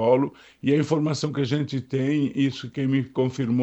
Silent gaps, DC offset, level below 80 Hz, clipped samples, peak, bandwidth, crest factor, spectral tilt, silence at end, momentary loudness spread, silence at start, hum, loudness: none; under 0.1%; -64 dBFS; under 0.1%; -6 dBFS; 8.2 kHz; 16 dB; -7 dB/octave; 0 s; 5 LU; 0 s; none; -25 LUFS